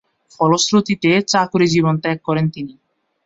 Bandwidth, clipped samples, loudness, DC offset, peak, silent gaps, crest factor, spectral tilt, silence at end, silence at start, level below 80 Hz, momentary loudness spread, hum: 7.8 kHz; under 0.1%; -16 LUFS; under 0.1%; -2 dBFS; none; 16 dB; -5 dB/octave; 0.55 s; 0.4 s; -56 dBFS; 7 LU; none